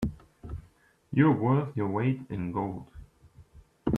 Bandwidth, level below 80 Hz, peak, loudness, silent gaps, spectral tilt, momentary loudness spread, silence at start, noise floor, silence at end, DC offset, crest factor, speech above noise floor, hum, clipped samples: 5.4 kHz; -50 dBFS; -10 dBFS; -28 LUFS; none; -9.5 dB/octave; 20 LU; 0 s; -61 dBFS; 0 s; under 0.1%; 20 dB; 34 dB; none; under 0.1%